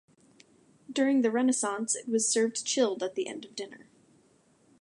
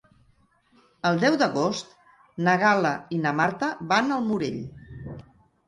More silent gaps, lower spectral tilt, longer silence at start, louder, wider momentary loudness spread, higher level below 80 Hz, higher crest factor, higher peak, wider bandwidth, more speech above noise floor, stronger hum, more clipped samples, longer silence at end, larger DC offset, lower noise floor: neither; second, -2.5 dB/octave vs -5.5 dB/octave; second, 0.9 s vs 1.05 s; second, -28 LUFS vs -24 LUFS; second, 14 LU vs 19 LU; second, -84 dBFS vs -60 dBFS; about the same, 16 dB vs 18 dB; second, -14 dBFS vs -8 dBFS; about the same, 11.5 kHz vs 11.5 kHz; about the same, 36 dB vs 39 dB; neither; neither; first, 1 s vs 0.45 s; neither; about the same, -65 dBFS vs -63 dBFS